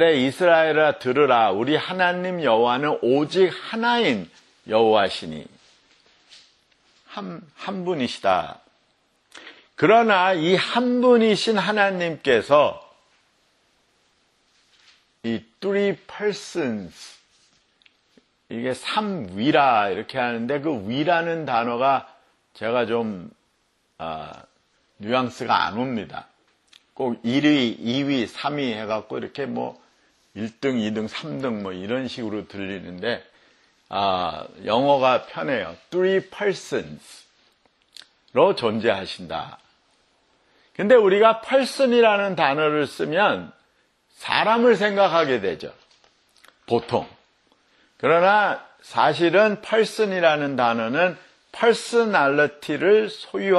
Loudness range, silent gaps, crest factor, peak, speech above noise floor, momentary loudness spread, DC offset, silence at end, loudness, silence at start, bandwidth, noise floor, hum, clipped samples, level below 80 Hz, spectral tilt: 9 LU; none; 22 dB; -2 dBFS; 47 dB; 15 LU; under 0.1%; 0 s; -21 LUFS; 0 s; 12 kHz; -67 dBFS; none; under 0.1%; -66 dBFS; -5 dB/octave